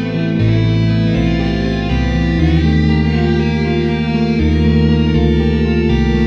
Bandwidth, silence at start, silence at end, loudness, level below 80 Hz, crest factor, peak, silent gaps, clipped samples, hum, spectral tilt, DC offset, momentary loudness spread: 7 kHz; 0 s; 0 s; -14 LUFS; -20 dBFS; 12 dB; -2 dBFS; none; under 0.1%; none; -8 dB/octave; under 0.1%; 3 LU